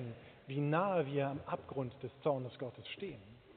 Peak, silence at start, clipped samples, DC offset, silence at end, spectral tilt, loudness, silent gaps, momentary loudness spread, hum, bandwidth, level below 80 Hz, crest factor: -20 dBFS; 0 s; under 0.1%; under 0.1%; 0.05 s; -6 dB/octave; -39 LUFS; none; 14 LU; none; 4.5 kHz; -72 dBFS; 18 dB